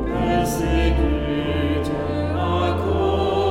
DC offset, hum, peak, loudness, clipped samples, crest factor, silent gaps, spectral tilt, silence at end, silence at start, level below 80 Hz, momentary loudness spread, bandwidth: under 0.1%; none; -6 dBFS; -21 LUFS; under 0.1%; 14 dB; none; -6.5 dB/octave; 0 s; 0 s; -28 dBFS; 3 LU; 16 kHz